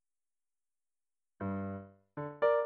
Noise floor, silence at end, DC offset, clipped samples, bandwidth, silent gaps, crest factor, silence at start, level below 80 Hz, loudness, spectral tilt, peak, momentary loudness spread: under -90 dBFS; 0 s; under 0.1%; under 0.1%; 4.4 kHz; none; 20 dB; 1.4 s; -76 dBFS; -38 LUFS; -6.5 dB/octave; -18 dBFS; 15 LU